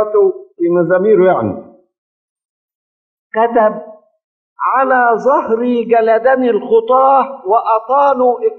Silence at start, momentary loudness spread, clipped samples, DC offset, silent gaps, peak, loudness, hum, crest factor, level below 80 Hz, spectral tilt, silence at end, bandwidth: 0 s; 7 LU; under 0.1%; under 0.1%; 1.98-2.36 s, 2.45-2.68 s, 2.75-3.30 s, 4.24-4.56 s; 0 dBFS; -12 LUFS; none; 14 dB; -60 dBFS; -8.5 dB/octave; 0 s; 6.2 kHz